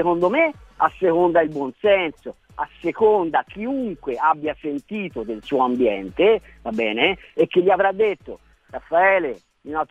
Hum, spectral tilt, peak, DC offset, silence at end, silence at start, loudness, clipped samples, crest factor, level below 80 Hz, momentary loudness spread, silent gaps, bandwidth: none; -7 dB/octave; 0 dBFS; under 0.1%; 0.05 s; 0 s; -20 LUFS; under 0.1%; 20 dB; -52 dBFS; 13 LU; none; 7.6 kHz